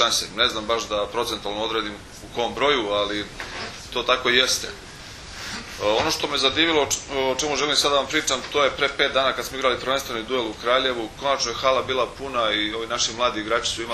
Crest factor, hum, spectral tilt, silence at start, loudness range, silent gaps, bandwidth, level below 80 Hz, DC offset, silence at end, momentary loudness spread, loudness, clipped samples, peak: 22 dB; none; -2 dB/octave; 0 s; 3 LU; none; 13.5 kHz; -48 dBFS; under 0.1%; 0 s; 13 LU; -22 LUFS; under 0.1%; -2 dBFS